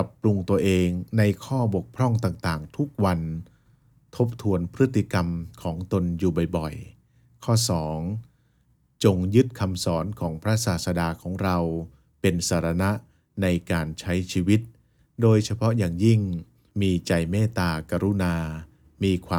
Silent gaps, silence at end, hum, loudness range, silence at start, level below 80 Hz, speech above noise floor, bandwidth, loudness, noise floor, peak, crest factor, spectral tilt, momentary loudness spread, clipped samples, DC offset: none; 0 s; none; 3 LU; 0 s; -50 dBFS; 41 dB; 17.5 kHz; -25 LUFS; -64 dBFS; -6 dBFS; 20 dB; -6.5 dB/octave; 11 LU; under 0.1%; under 0.1%